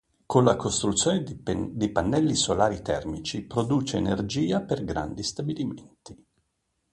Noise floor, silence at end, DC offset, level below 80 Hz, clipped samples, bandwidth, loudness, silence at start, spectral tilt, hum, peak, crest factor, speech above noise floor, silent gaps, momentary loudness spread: -76 dBFS; 0.8 s; under 0.1%; -48 dBFS; under 0.1%; 11.5 kHz; -26 LUFS; 0.3 s; -5 dB/octave; none; -6 dBFS; 22 dB; 50 dB; none; 9 LU